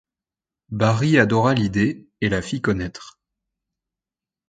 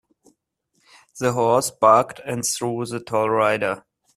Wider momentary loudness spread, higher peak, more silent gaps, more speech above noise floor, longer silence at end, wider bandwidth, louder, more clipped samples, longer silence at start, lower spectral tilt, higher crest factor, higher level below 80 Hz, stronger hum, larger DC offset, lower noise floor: about the same, 13 LU vs 11 LU; about the same, -2 dBFS vs -2 dBFS; neither; first, 70 dB vs 50 dB; first, 1.4 s vs 0.35 s; second, 9.2 kHz vs 15 kHz; about the same, -20 LUFS vs -20 LUFS; neither; second, 0.7 s vs 1.15 s; first, -6.5 dB/octave vs -4 dB/octave; about the same, 20 dB vs 20 dB; first, -46 dBFS vs -62 dBFS; neither; neither; first, -90 dBFS vs -70 dBFS